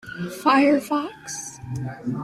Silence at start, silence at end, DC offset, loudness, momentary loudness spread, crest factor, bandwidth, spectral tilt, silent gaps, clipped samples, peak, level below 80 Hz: 0.05 s; 0 s; under 0.1%; -23 LUFS; 15 LU; 16 dB; 15 kHz; -5 dB/octave; none; under 0.1%; -6 dBFS; -58 dBFS